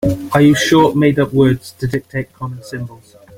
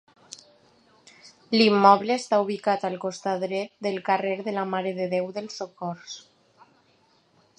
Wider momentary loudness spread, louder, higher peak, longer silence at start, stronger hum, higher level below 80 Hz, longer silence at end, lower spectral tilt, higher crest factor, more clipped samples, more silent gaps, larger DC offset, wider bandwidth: second, 17 LU vs 22 LU; first, -14 LUFS vs -24 LUFS; about the same, -2 dBFS vs -2 dBFS; second, 0 s vs 1.25 s; neither; first, -42 dBFS vs -78 dBFS; second, 0.45 s vs 1.4 s; about the same, -6 dB/octave vs -5 dB/octave; second, 14 dB vs 24 dB; neither; neither; neither; first, 16.5 kHz vs 10.5 kHz